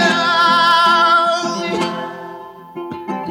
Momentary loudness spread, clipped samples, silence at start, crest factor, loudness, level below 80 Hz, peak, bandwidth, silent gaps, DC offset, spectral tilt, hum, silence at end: 20 LU; under 0.1%; 0 s; 14 dB; -13 LUFS; -64 dBFS; -2 dBFS; 17.5 kHz; none; under 0.1%; -3 dB/octave; none; 0 s